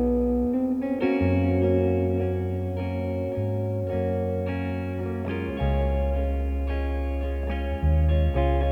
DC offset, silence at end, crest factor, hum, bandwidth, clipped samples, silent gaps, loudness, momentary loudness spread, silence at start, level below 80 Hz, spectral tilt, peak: under 0.1%; 0 s; 14 dB; none; 4.5 kHz; under 0.1%; none; -26 LUFS; 7 LU; 0 s; -30 dBFS; -10 dB/octave; -10 dBFS